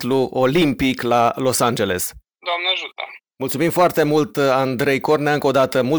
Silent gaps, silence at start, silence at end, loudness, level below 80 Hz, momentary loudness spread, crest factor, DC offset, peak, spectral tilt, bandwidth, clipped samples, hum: none; 0 s; 0 s; -18 LUFS; -50 dBFS; 9 LU; 14 dB; under 0.1%; -4 dBFS; -4.5 dB/octave; over 20 kHz; under 0.1%; none